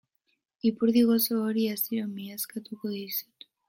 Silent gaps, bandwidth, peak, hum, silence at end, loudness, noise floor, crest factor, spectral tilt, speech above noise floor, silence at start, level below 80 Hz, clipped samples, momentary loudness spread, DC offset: none; 16.5 kHz; -12 dBFS; none; 0.45 s; -28 LUFS; -76 dBFS; 16 dB; -5 dB/octave; 49 dB; 0.65 s; -74 dBFS; under 0.1%; 13 LU; under 0.1%